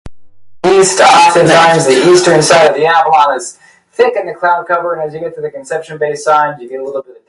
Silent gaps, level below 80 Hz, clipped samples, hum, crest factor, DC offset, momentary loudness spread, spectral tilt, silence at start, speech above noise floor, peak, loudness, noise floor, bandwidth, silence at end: none; -48 dBFS; under 0.1%; none; 10 dB; under 0.1%; 15 LU; -3.5 dB/octave; 0.05 s; 21 dB; 0 dBFS; -9 LUFS; -30 dBFS; 11.5 kHz; 0.25 s